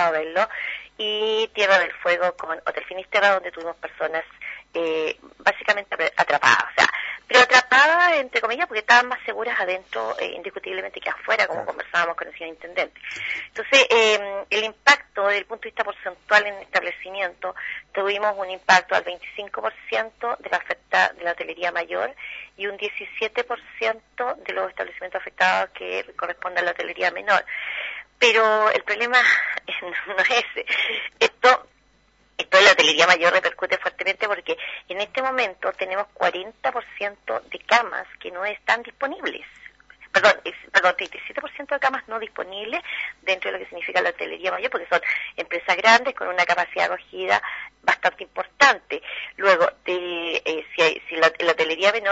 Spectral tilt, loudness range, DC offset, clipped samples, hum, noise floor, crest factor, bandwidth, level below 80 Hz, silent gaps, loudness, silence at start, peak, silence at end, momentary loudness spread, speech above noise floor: -1.5 dB/octave; 8 LU; under 0.1%; under 0.1%; none; -60 dBFS; 22 dB; 8 kHz; -64 dBFS; none; -21 LUFS; 0 s; 0 dBFS; 0 s; 14 LU; 38 dB